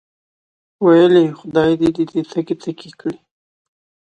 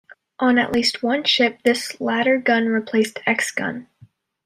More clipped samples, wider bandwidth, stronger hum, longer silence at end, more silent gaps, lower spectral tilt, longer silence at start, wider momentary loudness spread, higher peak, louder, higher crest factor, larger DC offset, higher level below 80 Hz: neither; second, 8.6 kHz vs 16 kHz; neither; first, 1 s vs 0.6 s; neither; first, -7.5 dB/octave vs -3.5 dB/octave; first, 0.8 s vs 0.4 s; first, 17 LU vs 6 LU; about the same, -2 dBFS vs -4 dBFS; first, -15 LUFS vs -19 LUFS; about the same, 16 dB vs 16 dB; neither; first, -54 dBFS vs -62 dBFS